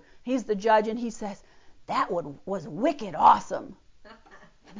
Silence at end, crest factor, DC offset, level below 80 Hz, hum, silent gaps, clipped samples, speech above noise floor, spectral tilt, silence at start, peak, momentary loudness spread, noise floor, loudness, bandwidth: 0 s; 20 dB; under 0.1%; -60 dBFS; none; none; under 0.1%; 27 dB; -5.5 dB/octave; 0.15 s; -6 dBFS; 17 LU; -53 dBFS; -26 LUFS; 7.6 kHz